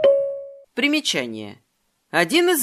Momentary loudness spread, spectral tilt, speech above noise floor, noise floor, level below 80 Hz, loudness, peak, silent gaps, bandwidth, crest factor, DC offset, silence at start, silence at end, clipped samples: 17 LU; -2.5 dB/octave; 24 dB; -45 dBFS; -70 dBFS; -21 LUFS; -2 dBFS; none; 15.5 kHz; 18 dB; under 0.1%; 0 s; 0 s; under 0.1%